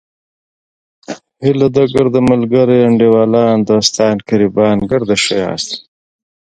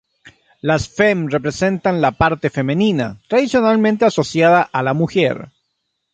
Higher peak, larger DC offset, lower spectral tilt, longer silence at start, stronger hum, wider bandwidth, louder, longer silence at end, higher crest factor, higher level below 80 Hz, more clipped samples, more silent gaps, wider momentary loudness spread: about the same, 0 dBFS vs 0 dBFS; neither; about the same, -5.5 dB/octave vs -6 dB/octave; first, 1.1 s vs 0.25 s; neither; first, 10.5 kHz vs 9.2 kHz; first, -12 LUFS vs -16 LUFS; about the same, 0.7 s vs 0.7 s; about the same, 12 dB vs 16 dB; about the same, -46 dBFS vs -44 dBFS; neither; neither; first, 11 LU vs 6 LU